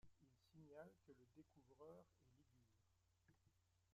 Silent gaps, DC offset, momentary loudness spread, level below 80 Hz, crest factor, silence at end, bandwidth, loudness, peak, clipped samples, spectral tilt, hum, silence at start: none; under 0.1%; 4 LU; -88 dBFS; 22 dB; 0 s; 7.6 kHz; -66 LUFS; -48 dBFS; under 0.1%; -6.5 dB/octave; none; 0 s